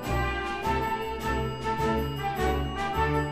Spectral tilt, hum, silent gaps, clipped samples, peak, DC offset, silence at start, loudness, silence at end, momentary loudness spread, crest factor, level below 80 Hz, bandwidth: -6 dB/octave; none; none; under 0.1%; -14 dBFS; under 0.1%; 0 s; -29 LUFS; 0 s; 3 LU; 14 dB; -36 dBFS; 15 kHz